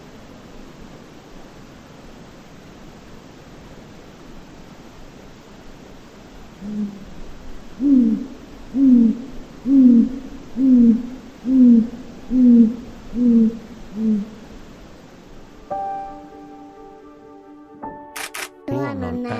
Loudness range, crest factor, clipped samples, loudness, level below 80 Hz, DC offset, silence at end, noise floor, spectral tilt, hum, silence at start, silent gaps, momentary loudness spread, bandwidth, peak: 19 LU; 18 dB; under 0.1%; -18 LUFS; -46 dBFS; under 0.1%; 0 s; -42 dBFS; -7 dB/octave; none; 0.15 s; none; 27 LU; 13.5 kHz; -2 dBFS